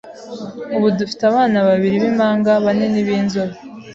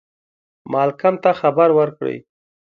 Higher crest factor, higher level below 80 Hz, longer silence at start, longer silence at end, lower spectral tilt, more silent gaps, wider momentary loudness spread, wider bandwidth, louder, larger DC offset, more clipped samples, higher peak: about the same, 14 dB vs 16 dB; first, -56 dBFS vs -68 dBFS; second, 0.05 s vs 0.65 s; second, 0 s vs 0.4 s; second, -7 dB/octave vs -8.5 dB/octave; neither; first, 16 LU vs 12 LU; first, 7.6 kHz vs 6.2 kHz; about the same, -16 LUFS vs -17 LUFS; neither; neither; about the same, -4 dBFS vs -2 dBFS